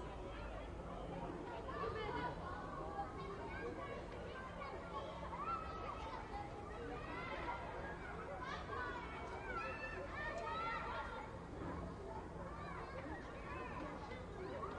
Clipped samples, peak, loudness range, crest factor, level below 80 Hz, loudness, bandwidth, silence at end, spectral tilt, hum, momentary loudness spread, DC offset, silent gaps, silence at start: under 0.1%; -32 dBFS; 2 LU; 16 dB; -56 dBFS; -47 LUFS; 11 kHz; 0 s; -6 dB/octave; none; 6 LU; under 0.1%; none; 0 s